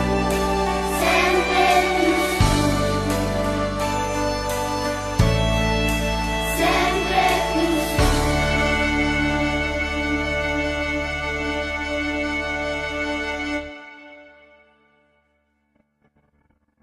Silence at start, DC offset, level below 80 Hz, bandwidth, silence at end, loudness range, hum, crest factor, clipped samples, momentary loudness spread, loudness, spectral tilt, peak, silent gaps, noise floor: 0 s; under 0.1%; -32 dBFS; 14 kHz; 2.6 s; 8 LU; none; 18 dB; under 0.1%; 7 LU; -21 LUFS; -4.5 dB/octave; -4 dBFS; none; -67 dBFS